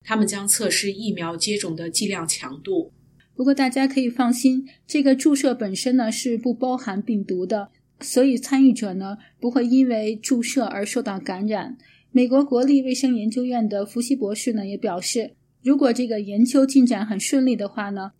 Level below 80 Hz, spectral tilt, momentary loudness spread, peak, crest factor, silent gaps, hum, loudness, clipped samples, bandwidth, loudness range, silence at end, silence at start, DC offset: -70 dBFS; -4 dB/octave; 9 LU; -6 dBFS; 16 dB; none; none; -21 LUFS; under 0.1%; 15.5 kHz; 3 LU; 0.1 s; 0.05 s; under 0.1%